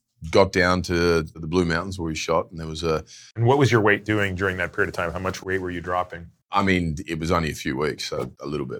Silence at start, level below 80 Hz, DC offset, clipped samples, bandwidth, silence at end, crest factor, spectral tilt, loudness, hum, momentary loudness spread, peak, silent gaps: 0.2 s; -44 dBFS; under 0.1%; under 0.1%; 19 kHz; 0 s; 20 dB; -5.5 dB/octave; -23 LUFS; none; 10 LU; -2 dBFS; none